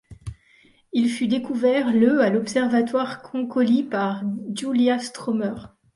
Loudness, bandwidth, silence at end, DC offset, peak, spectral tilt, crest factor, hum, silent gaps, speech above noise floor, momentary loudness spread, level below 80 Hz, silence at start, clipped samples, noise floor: -22 LUFS; 11.5 kHz; 0.3 s; under 0.1%; -6 dBFS; -5.5 dB/octave; 16 dB; none; none; 36 dB; 11 LU; -54 dBFS; 0.1 s; under 0.1%; -57 dBFS